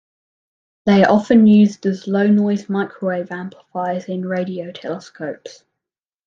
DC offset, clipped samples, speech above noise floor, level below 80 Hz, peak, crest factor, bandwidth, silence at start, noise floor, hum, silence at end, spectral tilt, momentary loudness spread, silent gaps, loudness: under 0.1%; under 0.1%; 69 dB; -62 dBFS; -2 dBFS; 16 dB; 7.2 kHz; 0.85 s; -86 dBFS; none; 0.75 s; -7.5 dB/octave; 17 LU; none; -17 LUFS